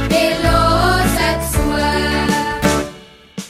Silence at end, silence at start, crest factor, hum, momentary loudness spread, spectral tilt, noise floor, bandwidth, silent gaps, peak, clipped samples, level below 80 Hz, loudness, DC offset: 0 s; 0 s; 16 dB; none; 5 LU; -4.5 dB/octave; -38 dBFS; 16 kHz; none; 0 dBFS; under 0.1%; -24 dBFS; -15 LUFS; under 0.1%